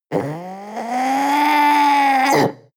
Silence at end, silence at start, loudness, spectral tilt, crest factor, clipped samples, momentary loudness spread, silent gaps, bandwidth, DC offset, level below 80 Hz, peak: 0.2 s; 0.1 s; -16 LUFS; -4.5 dB/octave; 12 dB; under 0.1%; 15 LU; none; over 20 kHz; under 0.1%; -68 dBFS; -4 dBFS